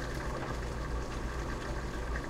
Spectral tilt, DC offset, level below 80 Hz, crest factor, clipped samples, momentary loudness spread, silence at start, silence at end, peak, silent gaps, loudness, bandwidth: -5.5 dB/octave; under 0.1%; -38 dBFS; 12 dB; under 0.1%; 1 LU; 0 s; 0 s; -24 dBFS; none; -38 LUFS; 15 kHz